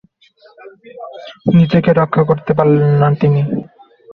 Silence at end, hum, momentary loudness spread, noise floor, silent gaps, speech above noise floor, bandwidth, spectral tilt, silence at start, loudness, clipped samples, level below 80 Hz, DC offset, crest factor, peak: 0.5 s; none; 20 LU; -49 dBFS; none; 36 dB; 5 kHz; -10.5 dB/octave; 0.65 s; -13 LUFS; under 0.1%; -48 dBFS; under 0.1%; 14 dB; -2 dBFS